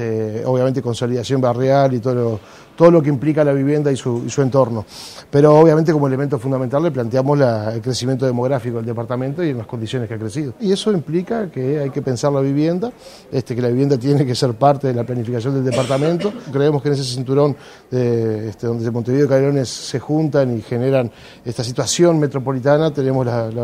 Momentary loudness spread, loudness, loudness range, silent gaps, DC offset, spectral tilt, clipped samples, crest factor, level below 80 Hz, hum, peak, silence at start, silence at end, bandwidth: 9 LU; -18 LUFS; 5 LU; none; under 0.1%; -6.5 dB/octave; under 0.1%; 16 dB; -54 dBFS; none; 0 dBFS; 0 s; 0 s; 13.5 kHz